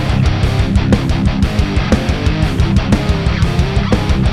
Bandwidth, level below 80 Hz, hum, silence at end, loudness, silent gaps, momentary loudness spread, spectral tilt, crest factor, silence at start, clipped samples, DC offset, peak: 12.5 kHz; -18 dBFS; none; 0 s; -14 LUFS; none; 2 LU; -6.5 dB/octave; 12 dB; 0 s; under 0.1%; under 0.1%; 0 dBFS